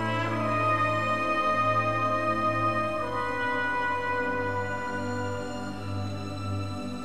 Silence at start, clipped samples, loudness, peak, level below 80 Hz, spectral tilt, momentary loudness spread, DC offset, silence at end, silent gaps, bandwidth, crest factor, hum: 0 s; under 0.1%; -28 LUFS; -14 dBFS; -54 dBFS; -6 dB/octave; 9 LU; 0.8%; 0 s; none; 13.5 kHz; 14 dB; none